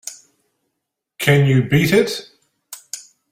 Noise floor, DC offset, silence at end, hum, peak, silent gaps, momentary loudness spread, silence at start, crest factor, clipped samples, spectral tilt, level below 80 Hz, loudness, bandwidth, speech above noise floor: -78 dBFS; under 0.1%; 0.3 s; none; -2 dBFS; none; 20 LU; 0.05 s; 18 dB; under 0.1%; -5.5 dB/octave; -50 dBFS; -16 LUFS; 16 kHz; 64 dB